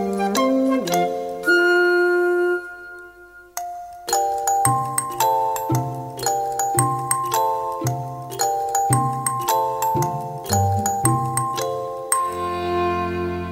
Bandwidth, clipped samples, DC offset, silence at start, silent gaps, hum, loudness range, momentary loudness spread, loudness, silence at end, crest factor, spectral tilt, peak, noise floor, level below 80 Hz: 16 kHz; under 0.1%; under 0.1%; 0 s; none; none; 2 LU; 11 LU; -21 LUFS; 0 s; 20 dB; -4.5 dB/octave; -2 dBFS; -45 dBFS; -52 dBFS